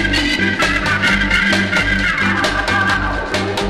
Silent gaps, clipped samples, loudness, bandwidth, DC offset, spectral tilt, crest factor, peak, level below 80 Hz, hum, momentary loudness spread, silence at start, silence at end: none; under 0.1%; -15 LUFS; 13 kHz; under 0.1%; -4 dB/octave; 14 dB; -2 dBFS; -28 dBFS; none; 4 LU; 0 s; 0 s